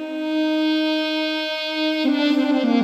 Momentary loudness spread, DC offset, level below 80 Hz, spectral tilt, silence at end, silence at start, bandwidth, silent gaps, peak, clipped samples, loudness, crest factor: 4 LU; under 0.1%; -72 dBFS; -4.5 dB/octave; 0 s; 0 s; 13.5 kHz; none; -8 dBFS; under 0.1%; -21 LUFS; 12 dB